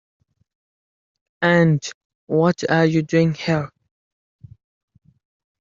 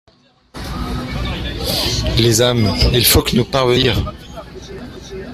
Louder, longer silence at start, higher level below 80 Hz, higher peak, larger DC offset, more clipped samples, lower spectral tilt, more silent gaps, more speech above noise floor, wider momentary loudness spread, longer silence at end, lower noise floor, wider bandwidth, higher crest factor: second, -19 LUFS vs -15 LUFS; first, 1.4 s vs 0.55 s; second, -60 dBFS vs -28 dBFS; about the same, -2 dBFS vs 0 dBFS; neither; neither; first, -6 dB/octave vs -4 dB/octave; first, 1.94-2.27 s vs none; first, over 72 dB vs 29 dB; second, 8 LU vs 20 LU; first, 1.95 s vs 0 s; first, under -90 dBFS vs -43 dBFS; second, 7.4 kHz vs 16 kHz; about the same, 20 dB vs 18 dB